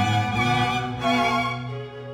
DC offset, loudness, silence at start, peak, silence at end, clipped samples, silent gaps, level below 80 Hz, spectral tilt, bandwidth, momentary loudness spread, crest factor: under 0.1%; -23 LUFS; 0 s; -10 dBFS; 0 s; under 0.1%; none; -48 dBFS; -5.5 dB/octave; 19 kHz; 11 LU; 14 dB